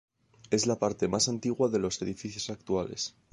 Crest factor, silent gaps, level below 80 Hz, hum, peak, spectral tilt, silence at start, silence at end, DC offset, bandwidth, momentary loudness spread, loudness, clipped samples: 20 dB; none; -58 dBFS; none; -12 dBFS; -4 dB/octave; 0.5 s; 0.25 s; under 0.1%; 11.5 kHz; 9 LU; -30 LUFS; under 0.1%